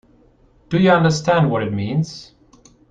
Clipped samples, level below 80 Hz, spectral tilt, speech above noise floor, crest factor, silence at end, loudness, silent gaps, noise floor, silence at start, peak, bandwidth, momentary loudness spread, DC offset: under 0.1%; -50 dBFS; -6.5 dB/octave; 36 dB; 18 dB; 0.65 s; -18 LUFS; none; -53 dBFS; 0.7 s; -2 dBFS; 8.8 kHz; 11 LU; under 0.1%